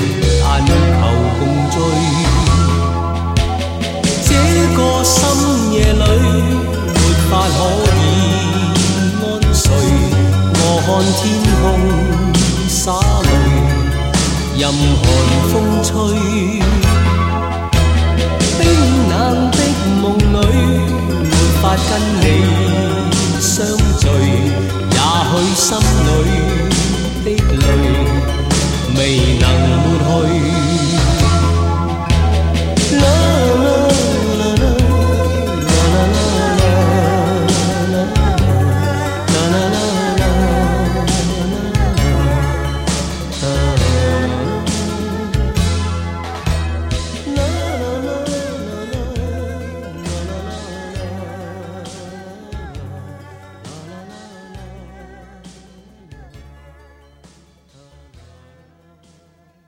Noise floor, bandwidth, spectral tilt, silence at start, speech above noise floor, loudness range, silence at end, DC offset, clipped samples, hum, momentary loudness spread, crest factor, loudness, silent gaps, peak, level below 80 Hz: -52 dBFS; 16.5 kHz; -5 dB/octave; 0 s; 39 dB; 9 LU; 3.2 s; under 0.1%; under 0.1%; none; 10 LU; 12 dB; -14 LUFS; none; -2 dBFS; -20 dBFS